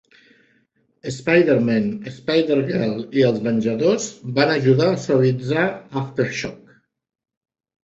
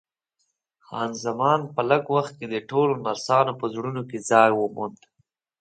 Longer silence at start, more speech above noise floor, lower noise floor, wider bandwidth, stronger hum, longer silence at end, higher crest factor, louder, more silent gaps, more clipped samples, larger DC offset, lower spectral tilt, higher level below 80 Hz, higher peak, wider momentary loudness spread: first, 1.05 s vs 0.9 s; second, 45 dB vs 52 dB; second, -64 dBFS vs -76 dBFS; second, 8.2 kHz vs 9.2 kHz; neither; first, 1.3 s vs 0.7 s; about the same, 18 dB vs 22 dB; first, -20 LUFS vs -23 LUFS; neither; neither; neither; about the same, -6 dB/octave vs -5 dB/octave; first, -58 dBFS vs -72 dBFS; about the same, -2 dBFS vs -2 dBFS; about the same, 11 LU vs 13 LU